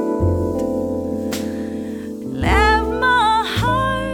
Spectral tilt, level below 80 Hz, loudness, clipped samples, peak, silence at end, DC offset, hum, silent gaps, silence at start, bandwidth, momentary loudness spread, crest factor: -5.5 dB/octave; -30 dBFS; -19 LUFS; under 0.1%; -2 dBFS; 0 s; under 0.1%; none; none; 0 s; 19.5 kHz; 12 LU; 16 dB